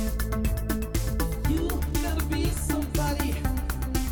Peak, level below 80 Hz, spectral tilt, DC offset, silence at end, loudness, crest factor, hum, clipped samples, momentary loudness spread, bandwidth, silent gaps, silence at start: -14 dBFS; -30 dBFS; -5.5 dB/octave; 0.1%; 0 s; -28 LUFS; 12 dB; none; under 0.1%; 2 LU; over 20 kHz; none; 0 s